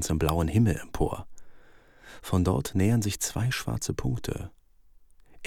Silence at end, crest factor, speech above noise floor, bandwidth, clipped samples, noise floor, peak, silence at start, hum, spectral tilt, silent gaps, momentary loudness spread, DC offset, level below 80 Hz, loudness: 0 s; 18 dB; 29 dB; 19 kHz; under 0.1%; -56 dBFS; -10 dBFS; 0 s; none; -5.5 dB/octave; none; 12 LU; under 0.1%; -42 dBFS; -28 LUFS